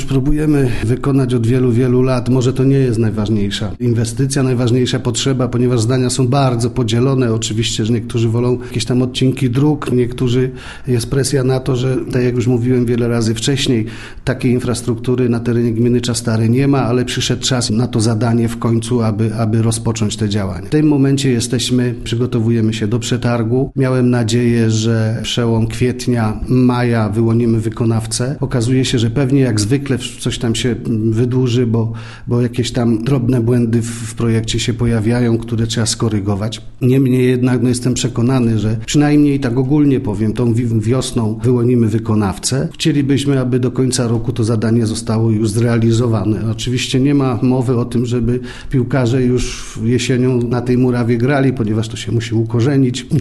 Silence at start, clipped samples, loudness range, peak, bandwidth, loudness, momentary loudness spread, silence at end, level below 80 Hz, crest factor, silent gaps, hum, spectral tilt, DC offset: 0 s; under 0.1%; 2 LU; -2 dBFS; 12.5 kHz; -15 LUFS; 5 LU; 0 s; -34 dBFS; 12 dB; none; none; -6 dB/octave; 0.1%